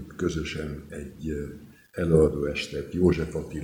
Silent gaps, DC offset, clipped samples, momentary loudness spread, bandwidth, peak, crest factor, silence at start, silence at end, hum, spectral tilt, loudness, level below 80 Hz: none; under 0.1%; under 0.1%; 18 LU; 16.5 kHz; -8 dBFS; 20 dB; 0 s; 0 s; none; -7 dB/octave; -27 LUFS; -42 dBFS